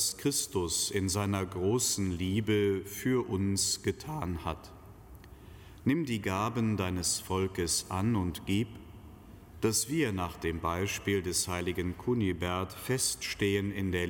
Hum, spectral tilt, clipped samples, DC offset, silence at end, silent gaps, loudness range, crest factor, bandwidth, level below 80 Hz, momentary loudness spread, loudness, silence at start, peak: none; -4 dB/octave; under 0.1%; under 0.1%; 0 s; none; 3 LU; 16 dB; 17.5 kHz; -52 dBFS; 7 LU; -31 LUFS; 0 s; -16 dBFS